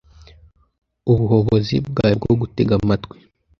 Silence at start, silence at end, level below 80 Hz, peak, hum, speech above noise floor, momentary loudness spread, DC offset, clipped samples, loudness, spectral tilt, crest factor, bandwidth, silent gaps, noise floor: 1.05 s; 0.55 s; -40 dBFS; -2 dBFS; none; 33 dB; 7 LU; under 0.1%; under 0.1%; -18 LUFS; -9 dB/octave; 18 dB; 6.6 kHz; none; -50 dBFS